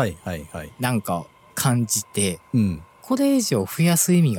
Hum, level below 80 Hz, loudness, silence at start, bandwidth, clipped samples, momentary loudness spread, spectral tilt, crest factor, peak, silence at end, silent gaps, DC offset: none; -52 dBFS; -22 LUFS; 0 s; 18 kHz; under 0.1%; 14 LU; -5 dB/octave; 16 dB; -6 dBFS; 0 s; none; under 0.1%